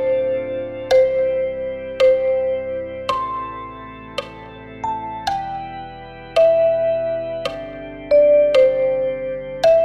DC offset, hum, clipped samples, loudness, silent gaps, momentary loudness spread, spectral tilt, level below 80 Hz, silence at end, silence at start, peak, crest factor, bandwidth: under 0.1%; none; under 0.1%; -19 LUFS; none; 18 LU; -5 dB/octave; -48 dBFS; 0 s; 0 s; -4 dBFS; 14 dB; 8.8 kHz